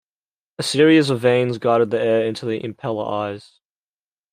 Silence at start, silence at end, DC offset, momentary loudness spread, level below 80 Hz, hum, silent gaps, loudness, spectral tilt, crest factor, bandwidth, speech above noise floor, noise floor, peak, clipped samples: 0.6 s; 0.95 s; under 0.1%; 12 LU; -66 dBFS; none; none; -19 LUFS; -5.5 dB/octave; 18 dB; 15.5 kHz; over 72 dB; under -90 dBFS; -2 dBFS; under 0.1%